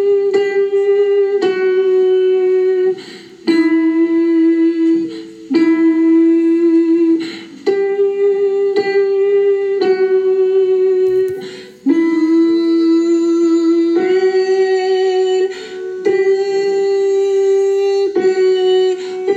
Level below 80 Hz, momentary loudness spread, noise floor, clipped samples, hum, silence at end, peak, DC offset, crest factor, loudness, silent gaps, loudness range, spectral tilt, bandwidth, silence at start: -68 dBFS; 6 LU; -33 dBFS; under 0.1%; none; 0 s; -2 dBFS; under 0.1%; 10 dB; -14 LUFS; none; 2 LU; -5 dB/octave; 8 kHz; 0 s